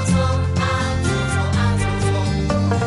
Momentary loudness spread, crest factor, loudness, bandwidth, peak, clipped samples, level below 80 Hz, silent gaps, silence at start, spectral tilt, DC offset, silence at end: 2 LU; 14 dB; -19 LUFS; 11.5 kHz; -4 dBFS; under 0.1%; -32 dBFS; none; 0 s; -6 dB/octave; under 0.1%; 0 s